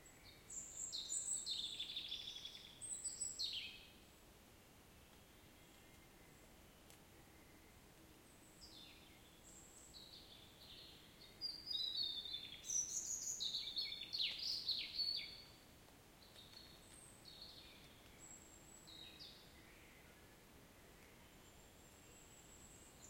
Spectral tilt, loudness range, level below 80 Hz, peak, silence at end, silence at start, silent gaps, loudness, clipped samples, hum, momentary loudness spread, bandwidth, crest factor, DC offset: 0.5 dB/octave; 21 LU; -72 dBFS; -30 dBFS; 0 s; 0 s; none; -44 LUFS; under 0.1%; none; 23 LU; 16.5 kHz; 22 dB; under 0.1%